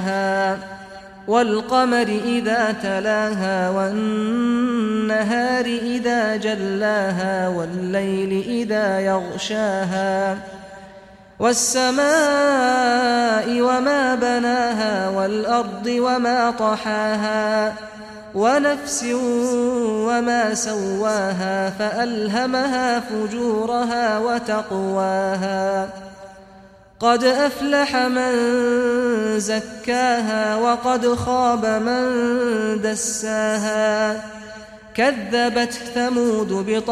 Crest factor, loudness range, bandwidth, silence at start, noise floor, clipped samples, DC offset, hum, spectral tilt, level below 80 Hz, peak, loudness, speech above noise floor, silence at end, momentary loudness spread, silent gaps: 16 dB; 3 LU; 14.5 kHz; 0 s; -46 dBFS; under 0.1%; under 0.1%; none; -4 dB/octave; -54 dBFS; -4 dBFS; -20 LUFS; 27 dB; 0 s; 6 LU; none